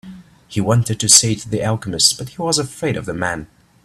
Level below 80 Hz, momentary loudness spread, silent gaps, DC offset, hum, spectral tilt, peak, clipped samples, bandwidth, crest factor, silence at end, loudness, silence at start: -48 dBFS; 13 LU; none; under 0.1%; none; -3 dB/octave; 0 dBFS; under 0.1%; 16 kHz; 18 dB; 0.4 s; -16 LUFS; 0.05 s